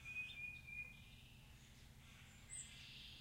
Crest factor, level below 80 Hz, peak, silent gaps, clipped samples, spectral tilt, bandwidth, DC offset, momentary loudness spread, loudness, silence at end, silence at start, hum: 16 dB; -68 dBFS; -40 dBFS; none; under 0.1%; -1.5 dB/octave; 16 kHz; under 0.1%; 15 LU; -54 LUFS; 0 s; 0 s; none